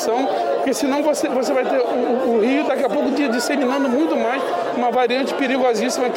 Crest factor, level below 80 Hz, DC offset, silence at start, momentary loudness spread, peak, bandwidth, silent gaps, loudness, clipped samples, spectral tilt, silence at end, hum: 10 dB; -68 dBFS; under 0.1%; 0 s; 2 LU; -8 dBFS; 17 kHz; none; -19 LUFS; under 0.1%; -3.5 dB/octave; 0 s; none